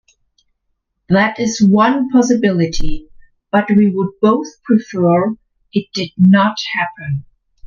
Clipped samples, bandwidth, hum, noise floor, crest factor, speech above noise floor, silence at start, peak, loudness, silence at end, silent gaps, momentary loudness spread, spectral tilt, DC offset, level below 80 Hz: under 0.1%; 7.2 kHz; none; -69 dBFS; 14 dB; 56 dB; 1.1 s; 0 dBFS; -15 LUFS; 0 s; none; 13 LU; -6 dB/octave; under 0.1%; -34 dBFS